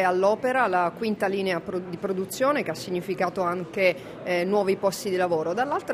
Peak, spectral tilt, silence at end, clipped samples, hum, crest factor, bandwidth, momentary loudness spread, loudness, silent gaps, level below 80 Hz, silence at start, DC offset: -8 dBFS; -5 dB/octave; 0 s; under 0.1%; none; 18 dB; 15.5 kHz; 7 LU; -25 LUFS; none; -64 dBFS; 0 s; under 0.1%